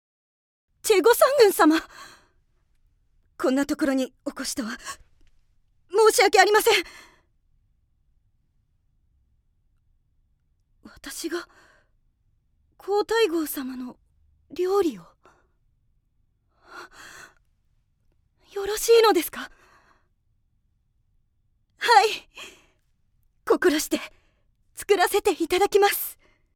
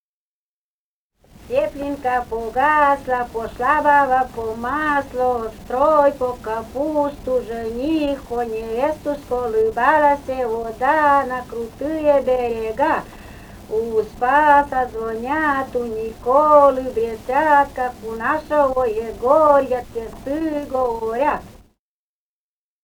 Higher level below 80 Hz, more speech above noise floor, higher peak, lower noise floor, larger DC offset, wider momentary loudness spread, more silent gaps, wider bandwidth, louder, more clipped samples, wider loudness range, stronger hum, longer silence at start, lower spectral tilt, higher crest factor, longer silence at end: second, -60 dBFS vs -44 dBFS; second, 46 dB vs over 71 dB; about the same, -2 dBFS vs 0 dBFS; second, -68 dBFS vs under -90 dBFS; neither; first, 23 LU vs 11 LU; neither; about the same, 19 kHz vs over 20 kHz; second, -22 LUFS vs -19 LUFS; neither; first, 14 LU vs 4 LU; neither; second, 0.85 s vs 1.4 s; second, -1.5 dB/octave vs -5.5 dB/octave; about the same, 22 dB vs 18 dB; second, 0.45 s vs 1.35 s